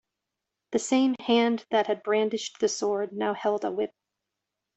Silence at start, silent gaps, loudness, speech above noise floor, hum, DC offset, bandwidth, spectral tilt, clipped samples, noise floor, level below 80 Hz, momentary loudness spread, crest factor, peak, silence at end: 0.7 s; none; -27 LUFS; 60 dB; none; under 0.1%; 8.4 kHz; -3.5 dB/octave; under 0.1%; -86 dBFS; -72 dBFS; 7 LU; 18 dB; -10 dBFS; 0.9 s